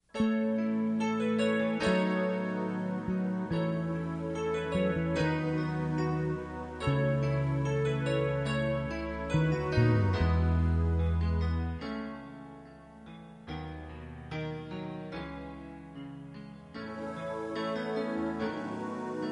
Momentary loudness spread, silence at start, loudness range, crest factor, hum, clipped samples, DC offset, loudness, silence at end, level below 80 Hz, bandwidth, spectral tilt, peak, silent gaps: 17 LU; 0.15 s; 12 LU; 16 dB; none; under 0.1%; under 0.1%; -32 LUFS; 0 s; -44 dBFS; 10 kHz; -7.5 dB/octave; -14 dBFS; none